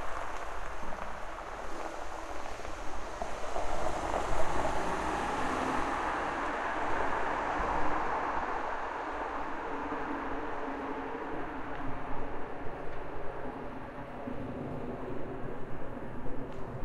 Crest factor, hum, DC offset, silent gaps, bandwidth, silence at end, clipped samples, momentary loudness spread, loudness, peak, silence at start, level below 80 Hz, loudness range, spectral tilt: 18 dB; none; under 0.1%; none; 11.5 kHz; 0 s; under 0.1%; 9 LU; -37 LUFS; -14 dBFS; 0 s; -44 dBFS; 8 LU; -5 dB/octave